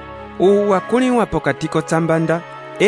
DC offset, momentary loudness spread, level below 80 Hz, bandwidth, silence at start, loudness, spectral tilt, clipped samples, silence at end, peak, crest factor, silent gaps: under 0.1%; 7 LU; -44 dBFS; 11 kHz; 0 s; -17 LUFS; -6 dB/octave; under 0.1%; 0 s; -2 dBFS; 14 dB; none